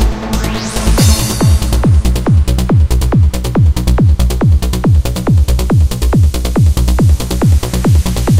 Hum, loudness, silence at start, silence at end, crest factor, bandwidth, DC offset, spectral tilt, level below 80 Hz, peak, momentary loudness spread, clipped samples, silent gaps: none; -12 LUFS; 0 s; 0 s; 10 dB; 16.5 kHz; under 0.1%; -6 dB/octave; -14 dBFS; 0 dBFS; 2 LU; under 0.1%; none